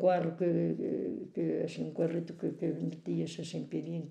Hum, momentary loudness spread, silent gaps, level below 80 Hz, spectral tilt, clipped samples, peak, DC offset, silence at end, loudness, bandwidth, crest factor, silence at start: none; 7 LU; none; -82 dBFS; -7.5 dB/octave; under 0.1%; -16 dBFS; under 0.1%; 0 s; -35 LUFS; 9.2 kHz; 16 dB; 0 s